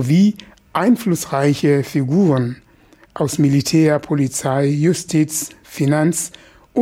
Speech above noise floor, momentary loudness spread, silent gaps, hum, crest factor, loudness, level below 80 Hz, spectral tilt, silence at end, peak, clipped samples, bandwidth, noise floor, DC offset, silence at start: 34 dB; 10 LU; none; none; 14 dB; -17 LUFS; -54 dBFS; -6 dB/octave; 0 s; -4 dBFS; under 0.1%; 16.5 kHz; -50 dBFS; under 0.1%; 0 s